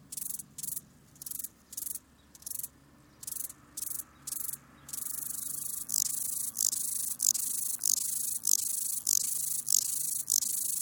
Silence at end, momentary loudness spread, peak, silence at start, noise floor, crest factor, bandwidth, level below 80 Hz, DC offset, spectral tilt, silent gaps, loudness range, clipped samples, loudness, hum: 0 s; 13 LU; -6 dBFS; 0 s; -59 dBFS; 28 dB; over 20 kHz; -70 dBFS; under 0.1%; 1.5 dB/octave; none; 11 LU; under 0.1%; -31 LUFS; none